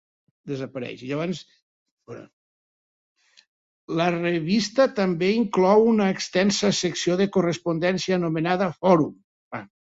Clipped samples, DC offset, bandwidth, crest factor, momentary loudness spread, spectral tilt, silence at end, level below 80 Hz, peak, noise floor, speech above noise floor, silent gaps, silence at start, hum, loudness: under 0.1%; under 0.1%; 8 kHz; 20 dB; 17 LU; -5.5 dB/octave; 0.25 s; -64 dBFS; -4 dBFS; under -90 dBFS; over 68 dB; 1.62-1.97 s, 2.33-3.15 s, 3.48-3.88 s, 9.24-9.51 s; 0.45 s; none; -23 LUFS